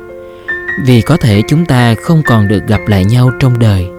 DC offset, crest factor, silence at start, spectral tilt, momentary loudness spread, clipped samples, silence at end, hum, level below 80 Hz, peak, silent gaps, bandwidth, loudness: under 0.1%; 10 dB; 0 s; -7 dB/octave; 9 LU; 0.1%; 0 s; none; -34 dBFS; 0 dBFS; none; 15 kHz; -10 LUFS